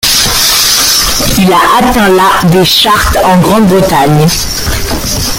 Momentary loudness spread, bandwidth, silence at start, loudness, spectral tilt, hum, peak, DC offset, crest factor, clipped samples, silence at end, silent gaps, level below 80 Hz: 7 LU; over 20 kHz; 0.05 s; -6 LUFS; -3.5 dB/octave; none; 0 dBFS; under 0.1%; 6 dB; 0.3%; 0 s; none; -22 dBFS